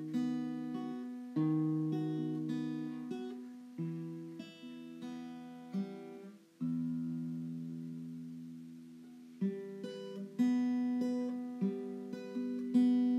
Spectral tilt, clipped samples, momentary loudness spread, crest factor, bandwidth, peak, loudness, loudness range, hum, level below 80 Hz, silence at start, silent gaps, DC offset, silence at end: -8.5 dB/octave; under 0.1%; 16 LU; 18 dB; 8.6 kHz; -20 dBFS; -38 LUFS; 7 LU; none; under -90 dBFS; 0 s; none; under 0.1%; 0 s